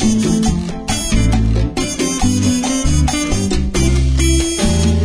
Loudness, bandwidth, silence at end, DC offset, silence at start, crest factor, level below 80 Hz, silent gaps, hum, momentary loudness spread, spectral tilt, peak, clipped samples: -16 LUFS; 11 kHz; 0 s; under 0.1%; 0 s; 12 dB; -20 dBFS; none; none; 4 LU; -5 dB/octave; -2 dBFS; under 0.1%